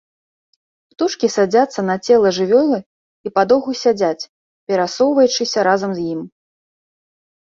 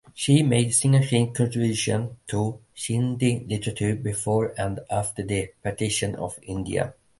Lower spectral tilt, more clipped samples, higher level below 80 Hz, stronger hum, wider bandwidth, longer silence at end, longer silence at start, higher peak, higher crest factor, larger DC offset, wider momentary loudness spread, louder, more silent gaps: about the same, -4.5 dB/octave vs -5 dB/octave; neither; second, -62 dBFS vs -50 dBFS; neither; second, 7.6 kHz vs 11.5 kHz; first, 1.2 s vs 0.3 s; first, 1 s vs 0.15 s; first, -2 dBFS vs -6 dBFS; about the same, 16 dB vs 18 dB; neither; about the same, 11 LU vs 11 LU; first, -16 LUFS vs -25 LUFS; first, 2.86-3.24 s, 4.29-4.67 s vs none